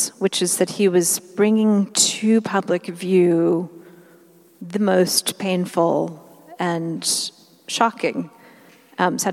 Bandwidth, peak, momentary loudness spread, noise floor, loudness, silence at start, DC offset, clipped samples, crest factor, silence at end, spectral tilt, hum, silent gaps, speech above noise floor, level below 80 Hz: 16 kHz; -2 dBFS; 12 LU; -51 dBFS; -20 LUFS; 0 s; under 0.1%; under 0.1%; 18 dB; 0 s; -4 dB/octave; none; none; 31 dB; -78 dBFS